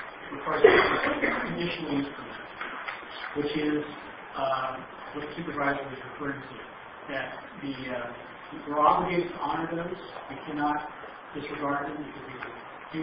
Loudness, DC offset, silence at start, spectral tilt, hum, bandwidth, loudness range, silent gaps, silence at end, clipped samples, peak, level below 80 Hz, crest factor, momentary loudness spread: -29 LUFS; under 0.1%; 0 s; -9.5 dB/octave; none; 5.6 kHz; 8 LU; none; 0 s; under 0.1%; -4 dBFS; -58 dBFS; 26 dB; 17 LU